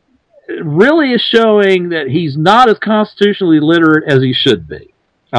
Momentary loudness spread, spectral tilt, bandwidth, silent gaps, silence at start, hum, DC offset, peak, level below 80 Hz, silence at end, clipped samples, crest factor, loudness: 9 LU; -6.5 dB/octave; 11 kHz; none; 0.5 s; none; under 0.1%; 0 dBFS; -50 dBFS; 0 s; 0.8%; 12 dB; -10 LUFS